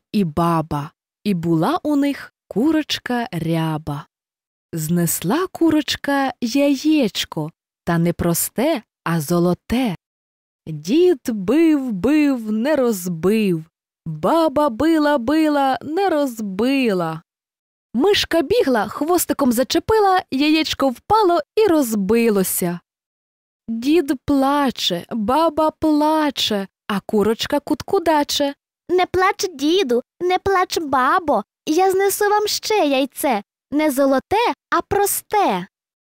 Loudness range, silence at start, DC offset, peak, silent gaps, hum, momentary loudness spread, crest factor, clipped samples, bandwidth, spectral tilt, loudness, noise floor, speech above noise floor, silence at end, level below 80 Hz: 4 LU; 0.15 s; under 0.1%; -6 dBFS; 4.47-4.69 s, 10.06-10.59 s, 17.59-17.90 s, 23.06-23.60 s; none; 8 LU; 12 dB; under 0.1%; 16 kHz; -4.5 dB/octave; -19 LUFS; under -90 dBFS; over 72 dB; 0.45 s; -48 dBFS